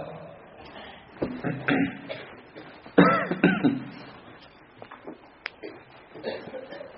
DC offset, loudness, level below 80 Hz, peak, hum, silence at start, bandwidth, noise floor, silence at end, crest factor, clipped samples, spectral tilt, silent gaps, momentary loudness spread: under 0.1%; -26 LUFS; -62 dBFS; -2 dBFS; none; 0 s; 5.8 kHz; -51 dBFS; 0 s; 26 dB; under 0.1%; -5 dB/octave; none; 25 LU